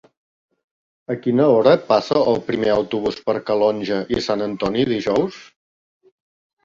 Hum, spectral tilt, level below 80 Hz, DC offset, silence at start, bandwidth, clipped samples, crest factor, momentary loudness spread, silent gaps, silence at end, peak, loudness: none; -6.5 dB/octave; -54 dBFS; under 0.1%; 1.1 s; 7.6 kHz; under 0.1%; 20 dB; 9 LU; none; 1.2 s; 0 dBFS; -19 LUFS